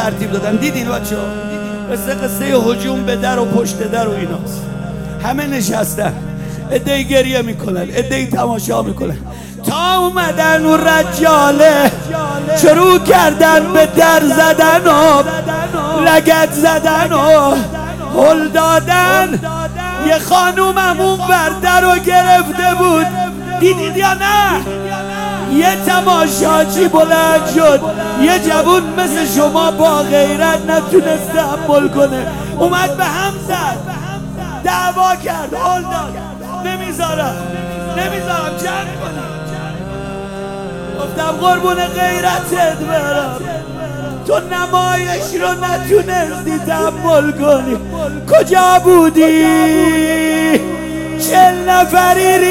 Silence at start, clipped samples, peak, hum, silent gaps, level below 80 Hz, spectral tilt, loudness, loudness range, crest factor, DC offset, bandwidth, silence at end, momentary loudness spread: 0 s; under 0.1%; 0 dBFS; none; none; -36 dBFS; -4.5 dB/octave; -12 LUFS; 8 LU; 12 dB; under 0.1%; 17.5 kHz; 0 s; 14 LU